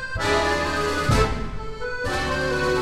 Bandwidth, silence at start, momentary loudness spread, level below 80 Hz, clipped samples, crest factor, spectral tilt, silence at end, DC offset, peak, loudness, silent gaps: 16 kHz; 0 s; 10 LU; -32 dBFS; under 0.1%; 16 dB; -4.5 dB/octave; 0 s; under 0.1%; -8 dBFS; -23 LUFS; none